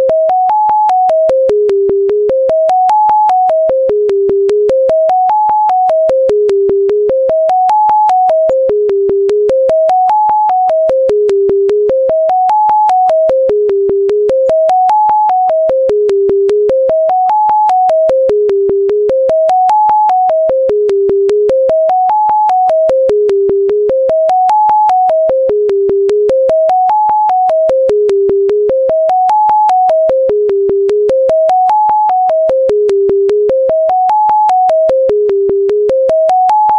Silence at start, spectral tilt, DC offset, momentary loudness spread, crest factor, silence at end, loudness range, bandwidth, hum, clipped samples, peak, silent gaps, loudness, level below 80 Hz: 0 s; -6.5 dB/octave; under 0.1%; 2 LU; 8 dB; 0 s; 0 LU; 8.4 kHz; none; under 0.1%; -2 dBFS; none; -10 LUFS; -46 dBFS